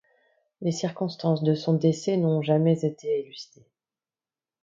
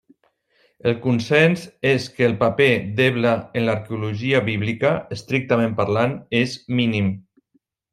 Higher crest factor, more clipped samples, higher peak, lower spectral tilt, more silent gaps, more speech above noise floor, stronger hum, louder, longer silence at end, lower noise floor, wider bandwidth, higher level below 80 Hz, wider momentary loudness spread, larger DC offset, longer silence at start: about the same, 18 dB vs 16 dB; neither; second, -10 dBFS vs -4 dBFS; about the same, -7.5 dB/octave vs -6.5 dB/octave; neither; first, over 65 dB vs 46 dB; neither; second, -25 LUFS vs -20 LUFS; first, 1.2 s vs 0.75 s; first, under -90 dBFS vs -66 dBFS; second, 7.6 kHz vs 13.5 kHz; second, -72 dBFS vs -58 dBFS; about the same, 9 LU vs 8 LU; neither; second, 0.6 s vs 0.85 s